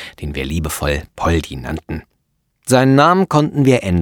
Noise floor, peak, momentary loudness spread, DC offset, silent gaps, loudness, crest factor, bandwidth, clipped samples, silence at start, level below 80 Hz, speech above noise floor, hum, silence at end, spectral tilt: -67 dBFS; 0 dBFS; 15 LU; under 0.1%; none; -16 LUFS; 16 dB; 18.5 kHz; under 0.1%; 0 s; -32 dBFS; 51 dB; none; 0 s; -6 dB/octave